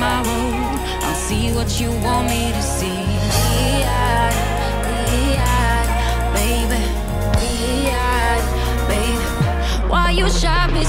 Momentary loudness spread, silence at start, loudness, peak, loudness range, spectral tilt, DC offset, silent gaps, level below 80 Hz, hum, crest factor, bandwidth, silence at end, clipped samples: 4 LU; 0 s; -19 LUFS; -4 dBFS; 1 LU; -4.5 dB/octave; under 0.1%; none; -22 dBFS; none; 14 dB; 16.5 kHz; 0 s; under 0.1%